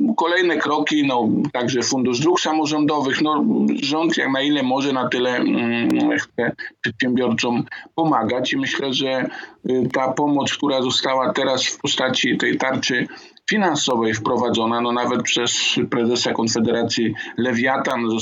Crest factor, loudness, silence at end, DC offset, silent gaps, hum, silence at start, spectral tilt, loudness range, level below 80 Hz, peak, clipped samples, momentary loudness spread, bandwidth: 14 dB; -19 LUFS; 0 s; under 0.1%; none; none; 0 s; -4 dB/octave; 2 LU; -66 dBFS; -6 dBFS; under 0.1%; 4 LU; 8 kHz